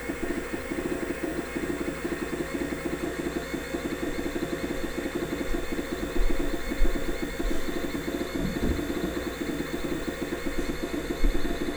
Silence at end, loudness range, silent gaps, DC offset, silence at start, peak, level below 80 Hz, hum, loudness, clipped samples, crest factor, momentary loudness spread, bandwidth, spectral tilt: 0 s; 1 LU; none; under 0.1%; 0 s; -10 dBFS; -34 dBFS; none; -31 LUFS; under 0.1%; 18 dB; 2 LU; 19.5 kHz; -5 dB/octave